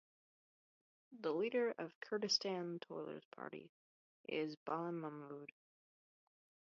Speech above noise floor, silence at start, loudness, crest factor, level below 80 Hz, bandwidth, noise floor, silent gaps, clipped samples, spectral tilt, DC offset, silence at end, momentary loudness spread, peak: over 47 dB; 1.1 s; -43 LUFS; 22 dB; under -90 dBFS; 7 kHz; under -90 dBFS; 1.95-2.01 s, 3.25-3.31 s, 3.69-4.24 s, 4.57-4.66 s; under 0.1%; -3 dB/octave; under 0.1%; 1.2 s; 16 LU; -24 dBFS